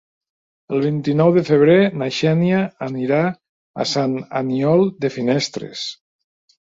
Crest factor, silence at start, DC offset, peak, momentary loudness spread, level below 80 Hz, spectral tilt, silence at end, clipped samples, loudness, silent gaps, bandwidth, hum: 16 dB; 0.7 s; under 0.1%; -2 dBFS; 12 LU; -60 dBFS; -6.5 dB/octave; 0.75 s; under 0.1%; -18 LUFS; 3.49-3.74 s; 8 kHz; none